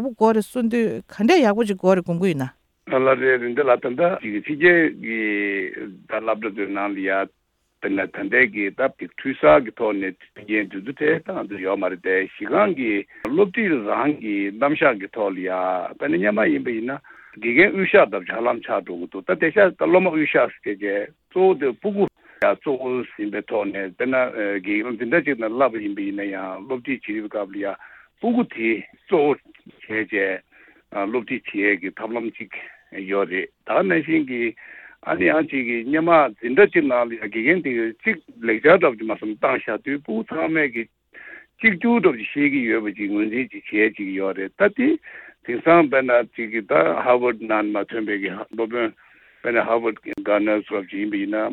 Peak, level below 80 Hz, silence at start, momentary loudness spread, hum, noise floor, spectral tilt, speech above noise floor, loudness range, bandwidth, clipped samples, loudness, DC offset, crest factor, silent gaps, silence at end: -2 dBFS; -62 dBFS; 0 s; 12 LU; none; -43 dBFS; -7 dB/octave; 22 dB; 5 LU; 12.5 kHz; under 0.1%; -21 LUFS; under 0.1%; 18 dB; none; 0 s